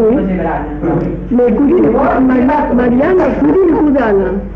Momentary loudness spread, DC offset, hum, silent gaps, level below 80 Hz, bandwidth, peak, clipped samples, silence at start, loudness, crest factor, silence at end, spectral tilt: 6 LU; under 0.1%; none; none; -28 dBFS; 5.6 kHz; -4 dBFS; under 0.1%; 0 s; -11 LUFS; 8 dB; 0 s; -10 dB/octave